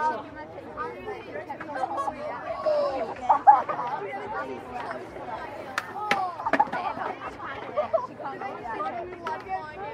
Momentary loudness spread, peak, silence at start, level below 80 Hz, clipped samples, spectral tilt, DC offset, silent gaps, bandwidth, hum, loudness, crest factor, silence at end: 12 LU; -4 dBFS; 0 s; -60 dBFS; under 0.1%; -5 dB/octave; under 0.1%; none; 12 kHz; none; -29 LUFS; 24 dB; 0 s